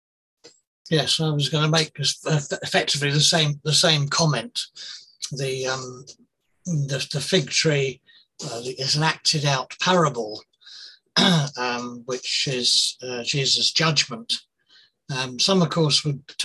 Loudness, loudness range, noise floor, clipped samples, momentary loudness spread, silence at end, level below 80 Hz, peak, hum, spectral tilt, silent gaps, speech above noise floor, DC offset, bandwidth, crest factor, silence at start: -21 LUFS; 5 LU; -58 dBFS; under 0.1%; 14 LU; 0 s; -62 dBFS; -4 dBFS; none; -3.5 dB/octave; 0.67-0.85 s; 35 dB; under 0.1%; 12.5 kHz; 20 dB; 0.45 s